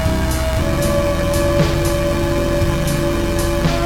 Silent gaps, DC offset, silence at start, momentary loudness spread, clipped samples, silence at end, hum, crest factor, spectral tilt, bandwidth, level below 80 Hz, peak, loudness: none; under 0.1%; 0 s; 2 LU; under 0.1%; 0 s; none; 12 dB; -5.5 dB/octave; 17.5 kHz; -22 dBFS; -4 dBFS; -18 LUFS